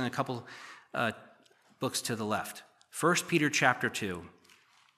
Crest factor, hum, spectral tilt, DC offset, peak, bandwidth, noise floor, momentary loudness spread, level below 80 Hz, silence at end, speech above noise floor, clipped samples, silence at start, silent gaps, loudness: 24 dB; none; -3.5 dB/octave; under 0.1%; -8 dBFS; 15 kHz; -63 dBFS; 18 LU; -74 dBFS; 0.65 s; 32 dB; under 0.1%; 0 s; none; -31 LUFS